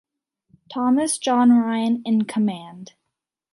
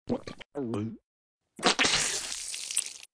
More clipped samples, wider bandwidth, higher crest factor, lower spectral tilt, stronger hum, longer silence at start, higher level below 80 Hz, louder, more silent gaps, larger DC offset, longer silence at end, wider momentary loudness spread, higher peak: neither; about the same, 11.5 kHz vs 11 kHz; second, 14 dB vs 24 dB; first, -4.5 dB/octave vs -1.5 dB/octave; neither; first, 0.7 s vs 0.05 s; second, -72 dBFS vs -60 dBFS; first, -20 LUFS vs -29 LUFS; second, none vs 0.46-0.52 s, 1.03-1.41 s; neither; first, 0.65 s vs 0.1 s; about the same, 16 LU vs 14 LU; about the same, -8 dBFS vs -8 dBFS